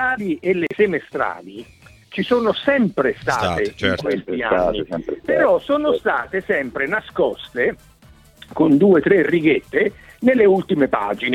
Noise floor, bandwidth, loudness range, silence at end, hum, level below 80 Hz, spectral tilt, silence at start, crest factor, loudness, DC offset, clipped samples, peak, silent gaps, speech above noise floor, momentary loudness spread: -48 dBFS; 13 kHz; 4 LU; 0 s; none; -48 dBFS; -6.5 dB/octave; 0 s; 16 dB; -19 LUFS; under 0.1%; under 0.1%; -4 dBFS; none; 30 dB; 10 LU